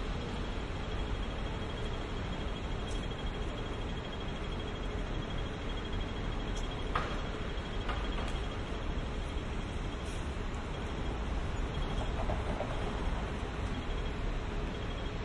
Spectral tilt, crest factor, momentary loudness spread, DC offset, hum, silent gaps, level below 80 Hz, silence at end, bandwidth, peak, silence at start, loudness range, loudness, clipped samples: -6 dB/octave; 20 dB; 3 LU; under 0.1%; none; none; -38 dBFS; 0 s; 11 kHz; -16 dBFS; 0 s; 2 LU; -38 LUFS; under 0.1%